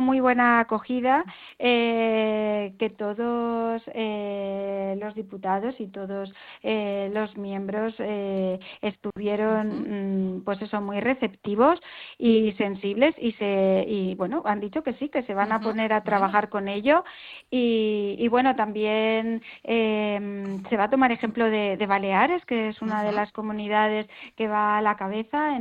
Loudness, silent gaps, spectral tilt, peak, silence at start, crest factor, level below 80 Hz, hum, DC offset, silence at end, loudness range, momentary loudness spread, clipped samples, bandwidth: -25 LUFS; none; -8 dB/octave; -8 dBFS; 0 s; 18 dB; -62 dBFS; none; under 0.1%; 0 s; 6 LU; 10 LU; under 0.1%; 5 kHz